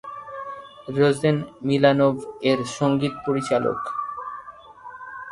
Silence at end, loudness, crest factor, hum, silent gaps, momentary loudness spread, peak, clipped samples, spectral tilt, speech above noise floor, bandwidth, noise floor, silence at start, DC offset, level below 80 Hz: 0 s; -22 LUFS; 20 dB; none; none; 19 LU; -2 dBFS; under 0.1%; -6.5 dB/octave; 21 dB; 11.5 kHz; -42 dBFS; 0.05 s; under 0.1%; -58 dBFS